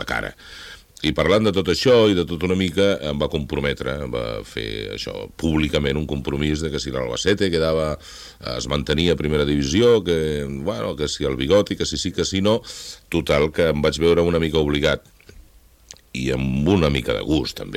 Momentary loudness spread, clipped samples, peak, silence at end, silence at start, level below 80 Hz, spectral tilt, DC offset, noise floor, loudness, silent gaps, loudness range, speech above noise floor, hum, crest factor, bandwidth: 11 LU; under 0.1%; -4 dBFS; 0 s; 0 s; -38 dBFS; -5.5 dB/octave; under 0.1%; -50 dBFS; -21 LUFS; none; 4 LU; 30 dB; none; 18 dB; 16 kHz